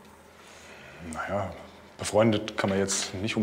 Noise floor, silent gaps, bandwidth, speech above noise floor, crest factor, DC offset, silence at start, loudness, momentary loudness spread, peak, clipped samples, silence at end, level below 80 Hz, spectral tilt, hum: -51 dBFS; none; 16 kHz; 24 dB; 20 dB; under 0.1%; 0 s; -28 LUFS; 23 LU; -10 dBFS; under 0.1%; 0 s; -58 dBFS; -4 dB/octave; none